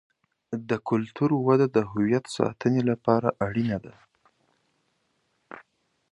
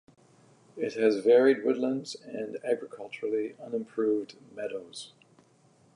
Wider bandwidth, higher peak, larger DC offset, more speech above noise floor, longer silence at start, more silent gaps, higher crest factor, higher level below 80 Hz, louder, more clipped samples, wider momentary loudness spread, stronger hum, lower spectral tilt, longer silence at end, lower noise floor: about the same, 11 kHz vs 11 kHz; first, -4 dBFS vs -10 dBFS; neither; first, 48 dB vs 34 dB; second, 0.5 s vs 0.75 s; neither; about the same, 22 dB vs 18 dB; first, -60 dBFS vs -84 dBFS; first, -25 LUFS vs -29 LUFS; neither; second, 16 LU vs 19 LU; neither; first, -7.5 dB/octave vs -5 dB/octave; second, 0.5 s vs 0.9 s; first, -72 dBFS vs -63 dBFS